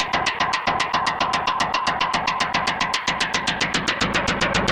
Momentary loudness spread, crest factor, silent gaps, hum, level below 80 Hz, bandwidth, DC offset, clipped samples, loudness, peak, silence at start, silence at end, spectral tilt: 1 LU; 16 dB; none; none; -44 dBFS; 14.5 kHz; under 0.1%; under 0.1%; -21 LUFS; -6 dBFS; 0 s; 0 s; -2.5 dB/octave